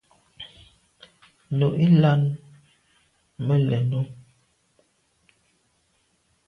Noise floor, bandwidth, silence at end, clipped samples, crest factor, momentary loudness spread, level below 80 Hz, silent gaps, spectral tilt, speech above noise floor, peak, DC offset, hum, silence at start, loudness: -68 dBFS; 5 kHz; 2.35 s; under 0.1%; 18 dB; 24 LU; -62 dBFS; none; -9.5 dB/octave; 48 dB; -8 dBFS; under 0.1%; none; 0.4 s; -22 LUFS